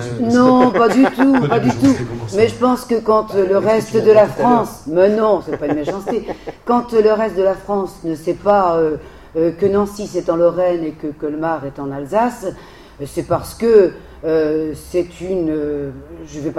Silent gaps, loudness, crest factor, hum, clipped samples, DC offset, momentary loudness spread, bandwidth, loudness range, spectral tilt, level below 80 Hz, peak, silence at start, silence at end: none; -16 LUFS; 16 dB; none; under 0.1%; under 0.1%; 13 LU; 14.5 kHz; 5 LU; -6.5 dB/octave; -44 dBFS; 0 dBFS; 0 s; 0 s